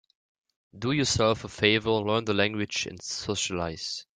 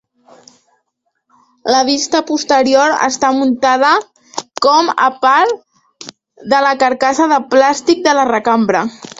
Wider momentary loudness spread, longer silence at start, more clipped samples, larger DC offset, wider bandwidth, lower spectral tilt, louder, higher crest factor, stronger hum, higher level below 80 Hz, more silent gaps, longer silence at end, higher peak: second, 9 LU vs 15 LU; second, 0.75 s vs 1.65 s; neither; neither; first, 9.6 kHz vs 8 kHz; about the same, -3.5 dB/octave vs -2.5 dB/octave; second, -27 LUFS vs -12 LUFS; first, 22 dB vs 14 dB; neither; about the same, -56 dBFS vs -58 dBFS; neither; about the same, 0.15 s vs 0.1 s; second, -6 dBFS vs 0 dBFS